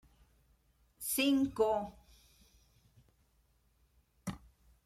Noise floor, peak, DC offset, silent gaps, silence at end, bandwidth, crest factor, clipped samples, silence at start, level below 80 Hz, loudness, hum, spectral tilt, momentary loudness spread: -72 dBFS; -20 dBFS; under 0.1%; none; 0.5 s; 16 kHz; 20 dB; under 0.1%; 1 s; -64 dBFS; -34 LUFS; none; -3.5 dB/octave; 17 LU